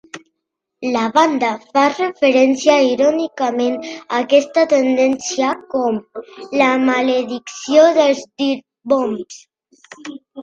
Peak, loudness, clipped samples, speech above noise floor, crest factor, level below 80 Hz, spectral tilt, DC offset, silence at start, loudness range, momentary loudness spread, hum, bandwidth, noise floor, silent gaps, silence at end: 0 dBFS; -16 LUFS; under 0.1%; 62 dB; 16 dB; -64 dBFS; -3.5 dB/octave; under 0.1%; 0.15 s; 2 LU; 14 LU; none; 8.8 kHz; -77 dBFS; none; 0 s